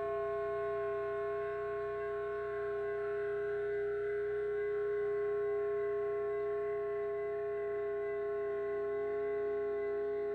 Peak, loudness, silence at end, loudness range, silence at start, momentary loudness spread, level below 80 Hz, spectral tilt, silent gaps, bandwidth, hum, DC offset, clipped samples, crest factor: -28 dBFS; -37 LUFS; 0 s; 2 LU; 0 s; 3 LU; -66 dBFS; -7.5 dB/octave; none; 4.4 kHz; 60 Hz at -75 dBFS; under 0.1%; under 0.1%; 8 dB